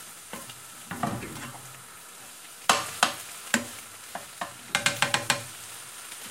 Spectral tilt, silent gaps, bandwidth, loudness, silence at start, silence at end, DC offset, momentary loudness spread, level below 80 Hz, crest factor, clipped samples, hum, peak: -1.5 dB/octave; none; 17 kHz; -29 LUFS; 0 s; 0 s; under 0.1%; 18 LU; -66 dBFS; 30 dB; under 0.1%; none; -2 dBFS